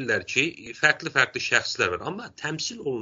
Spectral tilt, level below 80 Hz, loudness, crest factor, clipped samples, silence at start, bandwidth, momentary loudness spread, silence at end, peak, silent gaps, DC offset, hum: -1.5 dB/octave; -62 dBFS; -24 LUFS; 24 dB; under 0.1%; 0 s; 8 kHz; 10 LU; 0 s; -2 dBFS; none; under 0.1%; none